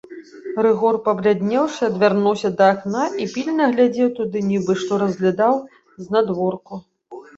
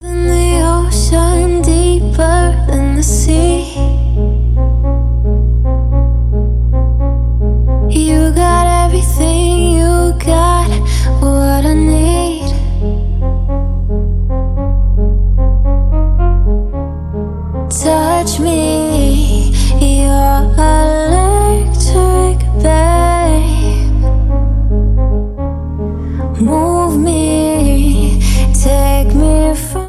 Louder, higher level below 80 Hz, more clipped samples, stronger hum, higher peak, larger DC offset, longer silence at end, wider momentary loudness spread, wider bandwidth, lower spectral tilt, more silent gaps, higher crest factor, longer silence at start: second, -19 LUFS vs -13 LUFS; second, -62 dBFS vs -12 dBFS; neither; neither; about the same, -2 dBFS vs 0 dBFS; neither; first, 0.15 s vs 0 s; first, 10 LU vs 6 LU; second, 8 kHz vs 13.5 kHz; about the same, -6.5 dB/octave vs -6 dB/octave; neither; first, 18 dB vs 10 dB; about the same, 0.1 s vs 0 s